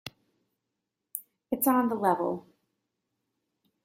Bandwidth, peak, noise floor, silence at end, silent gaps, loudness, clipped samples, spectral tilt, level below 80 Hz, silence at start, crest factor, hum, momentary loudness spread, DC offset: 16 kHz; -8 dBFS; -85 dBFS; 1.45 s; none; -27 LUFS; under 0.1%; -5 dB/octave; -72 dBFS; 0.05 s; 24 dB; none; 15 LU; under 0.1%